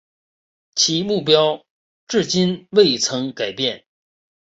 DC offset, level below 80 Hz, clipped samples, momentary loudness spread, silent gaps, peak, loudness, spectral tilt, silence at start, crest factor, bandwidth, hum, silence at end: under 0.1%; -62 dBFS; under 0.1%; 9 LU; 1.70-2.07 s; -2 dBFS; -18 LUFS; -3.5 dB/octave; 0.75 s; 20 dB; 8 kHz; none; 0.7 s